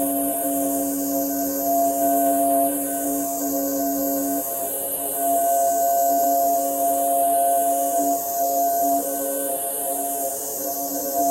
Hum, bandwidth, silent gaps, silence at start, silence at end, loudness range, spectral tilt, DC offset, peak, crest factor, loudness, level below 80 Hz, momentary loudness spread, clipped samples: none; 16.5 kHz; none; 0 s; 0 s; 2 LU; -3 dB/octave; under 0.1%; -8 dBFS; 14 dB; -21 LUFS; -64 dBFS; 5 LU; under 0.1%